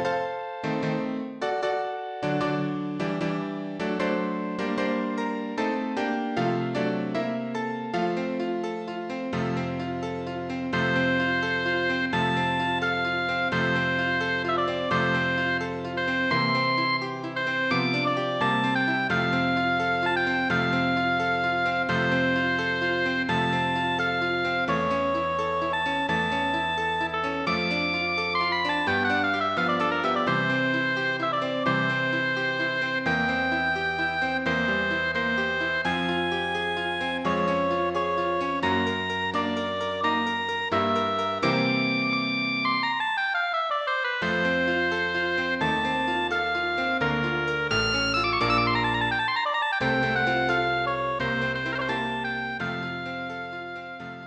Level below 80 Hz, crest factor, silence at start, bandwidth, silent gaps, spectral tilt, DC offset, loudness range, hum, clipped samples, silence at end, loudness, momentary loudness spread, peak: -54 dBFS; 16 dB; 0 s; 9.4 kHz; none; -5.5 dB/octave; under 0.1%; 4 LU; none; under 0.1%; 0 s; -25 LUFS; 6 LU; -10 dBFS